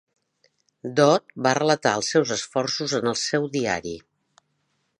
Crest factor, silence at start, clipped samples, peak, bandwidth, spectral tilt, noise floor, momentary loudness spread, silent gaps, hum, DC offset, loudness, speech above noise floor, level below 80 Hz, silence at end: 20 dB; 0.85 s; under 0.1%; -4 dBFS; 11 kHz; -4 dB/octave; -72 dBFS; 9 LU; none; none; under 0.1%; -23 LUFS; 50 dB; -62 dBFS; 1 s